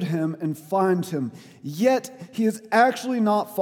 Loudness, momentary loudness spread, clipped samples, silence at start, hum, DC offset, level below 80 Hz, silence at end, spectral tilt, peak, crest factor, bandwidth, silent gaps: -23 LUFS; 13 LU; under 0.1%; 0 s; none; under 0.1%; -78 dBFS; 0 s; -6 dB/octave; -6 dBFS; 18 dB; 18 kHz; none